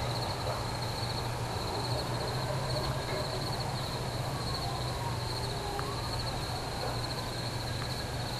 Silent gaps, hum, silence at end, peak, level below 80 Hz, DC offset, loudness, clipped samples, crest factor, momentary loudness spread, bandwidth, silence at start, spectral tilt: none; none; 0 s; -18 dBFS; -46 dBFS; under 0.1%; -34 LUFS; under 0.1%; 16 dB; 2 LU; 15 kHz; 0 s; -4.5 dB/octave